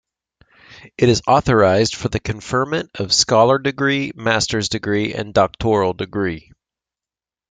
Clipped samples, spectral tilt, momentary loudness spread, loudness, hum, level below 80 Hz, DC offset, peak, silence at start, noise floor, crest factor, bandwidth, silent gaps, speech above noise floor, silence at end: under 0.1%; -4.5 dB/octave; 9 LU; -17 LUFS; none; -44 dBFS; under 0.1%; -2 dBFS; 0.7 s; under -90 dBFS; 18 dB; 9.6 kHz; none; over 73 dB; 1.1 s